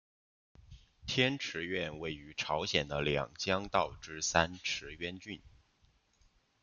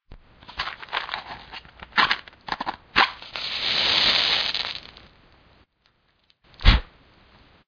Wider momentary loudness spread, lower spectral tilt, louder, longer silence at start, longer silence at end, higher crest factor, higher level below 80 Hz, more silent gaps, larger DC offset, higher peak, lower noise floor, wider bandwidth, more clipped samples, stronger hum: second, 11 LU vs 18 LU; about the same, -3.5 dB/octave vs -3.5 dB/octave; second, -34 LUFS vs -22 LUFS; first, 0.7 s vs 0.1 s; first, 1.15 s vs 0.8 s; about the same, 28 dB vs 24 dB; second, -60 dBFS vs -32 dBFS; neither; neither; second, -10 dBFS vs -2 dBFS; first, -71 dBFS vs -66 dBFS; first, 10 kHz vs 5.4 kHz; neither; neither